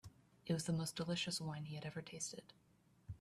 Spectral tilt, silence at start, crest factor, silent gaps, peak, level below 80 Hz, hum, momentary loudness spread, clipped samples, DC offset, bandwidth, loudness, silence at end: -4.5 dB/octave; 0.05 s; 18 dB; none; -28 dBFS; -72 dBFS; none; 16 LU; under 0.1%; under 0.1%; 14 kHz; -43 LUFS; 0.05 s